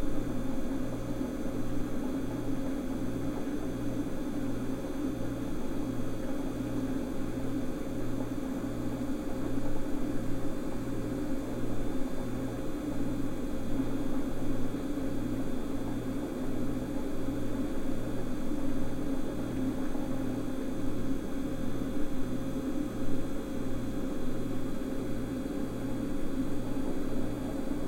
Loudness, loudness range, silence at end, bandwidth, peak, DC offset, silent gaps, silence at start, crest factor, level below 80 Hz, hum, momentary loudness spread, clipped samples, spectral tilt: -35 LUFS; 1 LU; 0 s; 16 kHz; -16 dBFS; under 0.1%; none; 0 s; 14 dB; -40 dBFS; none; 2 LU; under 0.1%; -7 dB/octave